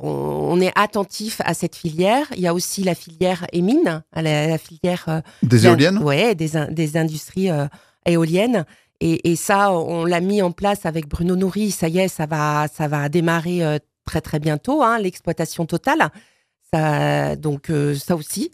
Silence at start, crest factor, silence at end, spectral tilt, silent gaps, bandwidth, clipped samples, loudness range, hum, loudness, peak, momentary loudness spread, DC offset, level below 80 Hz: 0 s; 20 dB; 0.05 s; -5.5 dB/octave; none; 15.5 kHz; under 0.1%; 3 LU; none; -20 LUFS; 0 dBFS; 7 LU; under 0.1%; -48 dBFS